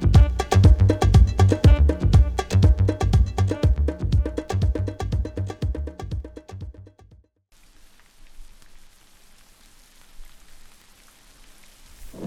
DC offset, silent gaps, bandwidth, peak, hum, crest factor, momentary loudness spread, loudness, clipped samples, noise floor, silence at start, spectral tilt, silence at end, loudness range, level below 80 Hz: under 0.1%; none; 11 kHz; -4 dBFS; none; 18 dB; 17 LU; -20 LUFS; under 0.1%; -56 dBFS; 0 s; -7.5 dB/octave; 0 s; 18 LU; -24 dBFS